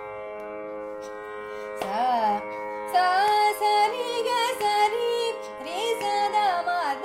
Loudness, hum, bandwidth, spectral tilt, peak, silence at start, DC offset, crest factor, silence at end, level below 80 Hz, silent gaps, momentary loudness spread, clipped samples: -25 LUFS; none; 16 kHz; -2 dB/octave; -12 dBFS; 0 s; under 0.1%; 14 dB; 0 s; -66 dBFS; none; 14 LU; under 0.1%